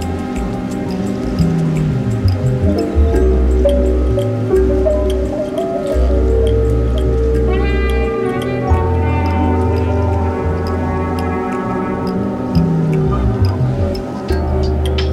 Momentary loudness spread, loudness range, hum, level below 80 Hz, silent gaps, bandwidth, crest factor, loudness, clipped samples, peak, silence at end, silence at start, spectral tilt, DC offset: 5 LU; 2 LU; none; -20 dBFS; none; 12 kHz; 14 dB; -16 LUFS; under 0.1%; -2 dBFS; 0 s; 0 s; -8 dB/octave; under 0.1%